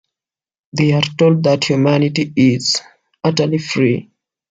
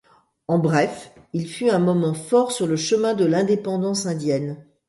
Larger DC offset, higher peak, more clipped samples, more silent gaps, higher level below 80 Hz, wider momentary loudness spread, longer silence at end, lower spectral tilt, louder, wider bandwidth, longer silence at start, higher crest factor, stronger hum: neither; first, 0 dBFS vs -6 dBFS; neither; neither; first, -58 dBFS vs -64 dBFS; second, 6 LU vs 11 LU; first, 0.5 s vs 0.25 s; about the same, -5.5 dB/octave vs -5.5 dB/octave; first, -15 LUFS vs -21 LUFS; second, 9.2 kHz vs 11.5 kHz; first, 0.75 s vs 0.5 s; about the same, 16 dB vs 16 dB; neither